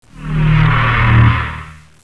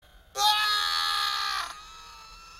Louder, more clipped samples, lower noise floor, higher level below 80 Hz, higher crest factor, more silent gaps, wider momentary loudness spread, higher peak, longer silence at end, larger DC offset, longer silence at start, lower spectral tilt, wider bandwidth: first, -12 LUFS vs -25 LUFS; neither; second, -32 dBFS vs -48 dBFS; first, -22 dBFS vs -58 dBFS; second, 14 dB vs 20 dB; neither; second, 13 LU vs 22 LU; first, 0 dBFS vs -10 dBFS; first, 0.45 s vs 0 s; neither; second, 0.15 s vs 0.35 s; first, -8 dB/octave vs 2.5 dB/octave; second, 5.2 kHz vs 16 kHz